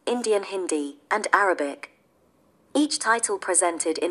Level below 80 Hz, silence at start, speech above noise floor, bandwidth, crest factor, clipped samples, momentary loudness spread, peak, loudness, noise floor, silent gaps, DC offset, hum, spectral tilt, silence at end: -76 dBFS; 0.05 s; 38 dB; 12 kHz; 24 dB; under 0.1%; 9 LU; -2 dBFS; -24 LUFS; -62 dBFS; none; under 0.1%; none; -1 dB/octave; 0 s